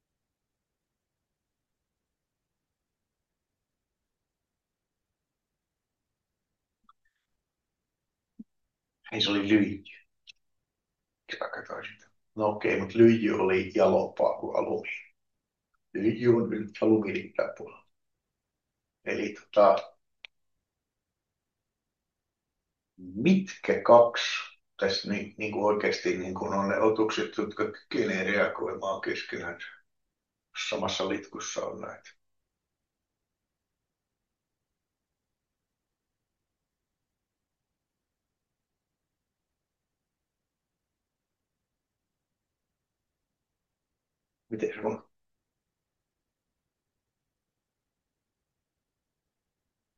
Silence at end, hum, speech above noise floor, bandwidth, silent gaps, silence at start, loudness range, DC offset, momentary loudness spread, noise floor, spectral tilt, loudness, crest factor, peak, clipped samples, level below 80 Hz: 5 s; none; 60 dB; 7.4 kHz; none; 8.4 s; 14 LU; under 0.1%; 18 LU; -87 dBFS; -5.5 dB/octave; -27 LUFS; 26 dB; -6 dBFS; under 0.1%; -78 dBFS